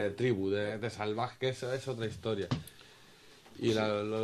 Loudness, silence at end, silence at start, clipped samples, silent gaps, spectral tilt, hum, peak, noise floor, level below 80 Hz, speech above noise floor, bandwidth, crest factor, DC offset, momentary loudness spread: -34 LUFS; 0 s; 0 s; under 0.1%; none; -6 dB/octave; none; -16 dBFS; -58 dBFS; -66 dBFS; 24 dB; 13.5 kHz; 18 dB; under 0.1%; 7 LU